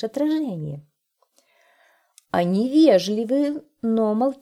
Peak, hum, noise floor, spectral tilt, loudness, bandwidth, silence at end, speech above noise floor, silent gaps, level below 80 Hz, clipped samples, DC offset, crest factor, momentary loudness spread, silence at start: -4 dBFS; none; -66 dBFS; -6.5 dB/octave; -21 LUFS; 13.5 kHz; 0.1 s; 46 dB; none; -68 dBFS; under 0.1%; under 0.1%; 18 dB; 13 LU; 0 s